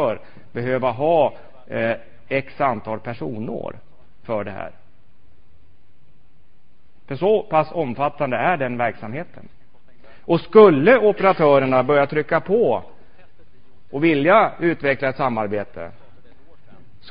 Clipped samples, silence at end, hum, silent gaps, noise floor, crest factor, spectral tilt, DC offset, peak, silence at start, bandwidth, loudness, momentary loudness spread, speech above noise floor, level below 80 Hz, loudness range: under 0.1%; 0 s; none; none; -59 dBFS; 20 dB; -11 dB/octave; 2%; 0 dBFS; 0 s; 5.2 kHz; -19 LUFS; 18 LU; 40 dB; -54 dBFS; 15 LU